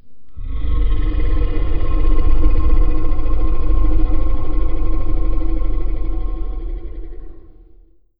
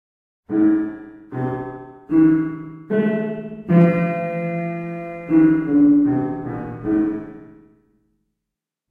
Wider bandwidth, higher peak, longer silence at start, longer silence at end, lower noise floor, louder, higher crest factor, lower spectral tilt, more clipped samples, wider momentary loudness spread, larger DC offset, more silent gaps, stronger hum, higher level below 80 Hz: about the same, 3.4 kHz vs 3.5 kHz; about the same, -2 dBFS vs -4 dBFS; second, 0.05 s vs 0.5 s; second, 0.8 s vs 1.4 s; second, -46 dBFS vs -83 dBFS; second, -23 LUFS vs -19 LUFS; about the same, 12 dB vs 16 dB; first, -12.5 dB/octave vs -11 dB/octave; neither; second, 12 LU vs 16 LU; neither; neither; neither; first, -16 dBFS vs -52 dBFS